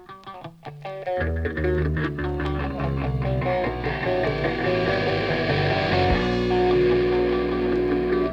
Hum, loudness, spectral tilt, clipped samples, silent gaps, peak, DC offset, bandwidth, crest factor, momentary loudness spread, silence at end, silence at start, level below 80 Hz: none; -23 LUFS; -8 dB/octave; under 0.1%; none; -8 dBFS; under 0.1%; 7.2 kHz; 16 dB; 9 LU; 0 s; 0 s; -34 dBFS